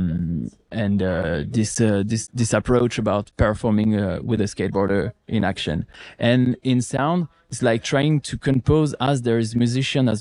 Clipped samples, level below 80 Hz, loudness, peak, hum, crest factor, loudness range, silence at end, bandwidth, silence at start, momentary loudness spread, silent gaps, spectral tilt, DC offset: under 0.1%; -40 dBFS; -21 LUFS; -4 dBFS; none; 18 dB; 1 LU; 0 s; 11.5 kHz; 0 s; 6 LU; none; -6 dB/octave; under 0.1%